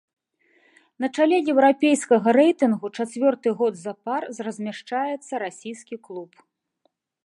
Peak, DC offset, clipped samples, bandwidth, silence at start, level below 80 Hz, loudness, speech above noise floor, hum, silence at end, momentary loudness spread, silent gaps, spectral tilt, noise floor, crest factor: -4 dBFS; under 0.1%; under 0.1%; 11.5 kHz; 1 s; -80 dBFS; -22 LUFS; 49 dB; none; 1 s; 18 LU; none; -5 dB/octave; -71 dBFS; 18 dB